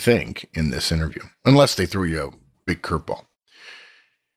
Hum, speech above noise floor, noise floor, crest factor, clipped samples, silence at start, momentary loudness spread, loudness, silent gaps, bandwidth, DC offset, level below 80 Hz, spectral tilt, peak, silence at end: none; 36 dB; -56 dBFS; 20 dB; under 0.1%; 0 s; 18 LU; -22 LUFS; none; 15.5 kHz; under 0.1%; -40 dBFS; -5.5 dB/octave; -4 dBFS; 0.6 s